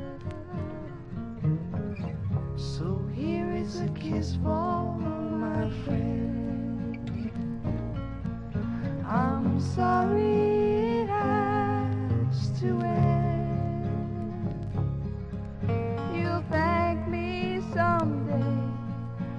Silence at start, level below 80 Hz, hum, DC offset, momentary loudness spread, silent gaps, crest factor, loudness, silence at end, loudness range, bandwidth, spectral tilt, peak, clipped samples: 0 s; -46 dBFS; none; under 0.1%; 10 LU; none; 16 dB; -29 LUFS; 0 s; 6 LU; 8.8 kHz; -8.5 dB/octave; -12 dBFS; under 0.1%